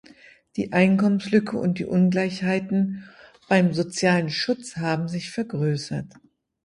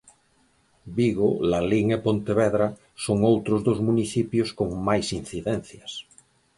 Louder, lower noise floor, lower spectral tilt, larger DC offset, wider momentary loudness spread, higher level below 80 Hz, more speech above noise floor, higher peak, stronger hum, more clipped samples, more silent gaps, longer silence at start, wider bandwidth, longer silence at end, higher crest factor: about the same, -23 LUFS vs -24 LUFS; second, -51 dBFS vs -64 dBFS; about the same, -6 dB/octave vs -6.5 dB/octave; neither; about the same, 10 LU vs 11 LU; second, -60 dBFS vs -50 dBFS; second, 29 dB vs 40 dB; first, -4 dBFS vs -8 dBFS; neither; neither; neither; second, 0.55 s vs 0.85 s; about the same, 11 kHz vs 11.5 kHz; about the same, 0.6 s vs 0.55 s; about the same, 20 dB vs 18 dB